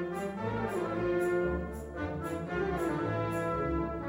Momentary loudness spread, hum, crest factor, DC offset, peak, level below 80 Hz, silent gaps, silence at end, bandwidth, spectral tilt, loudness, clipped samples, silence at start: 6 LU; none; 14 dB; under 0.1%; -20 dBFS; -46 dBFS; none; 0 s; 16 kHz; -7.5 dB/octave; -33 LUFS; under 0.1%; 0 s